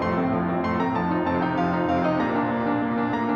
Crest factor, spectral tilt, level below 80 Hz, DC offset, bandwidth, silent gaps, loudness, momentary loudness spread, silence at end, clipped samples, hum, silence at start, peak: 12 dB; -8.5 dB/octave; -52 dBFS; under 0.1%; 7 kHz; none; -24 LUFS; 2 LU; 0 s; under 0.1%; none; 0 s; -12 dBFS